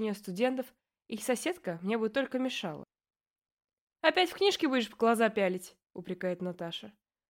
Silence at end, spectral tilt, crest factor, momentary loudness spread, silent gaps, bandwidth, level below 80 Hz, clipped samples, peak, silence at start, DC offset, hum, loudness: 0.4 s; -4 dB/octave; 22 dB; 15 LU; 3.27-3.42 s, 3.52-3.57 s, 3.81-3.87 s; 16.5 kHz; -76 dBFS; under 0.1%; -10 dBFS; 0 s; under 0.1%; none; -31 LUFS